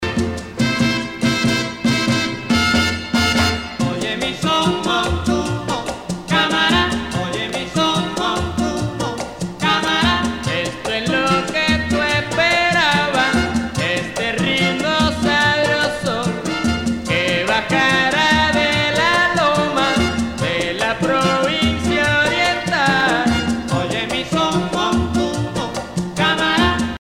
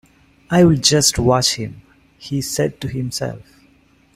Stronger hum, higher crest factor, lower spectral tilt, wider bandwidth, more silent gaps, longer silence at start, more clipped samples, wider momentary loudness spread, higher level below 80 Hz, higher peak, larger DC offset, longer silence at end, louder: neither; about the same, 16 dB vs 18 dB; about the same, -4 dB/octave vs -4 dB/octave; about the same, 16.5 kHz vs 16 kHz; neither; second, 0 s vs 0.5 s; neither; second, 7 LU vs 16 LU; first, -36 dBFS vs -42 dBFS; about the same, -2 dBFS vs 0 dBFS; neither; second, 0.05 s vs 0.75 s; about the same, -17 LUFS vs -17 LUFS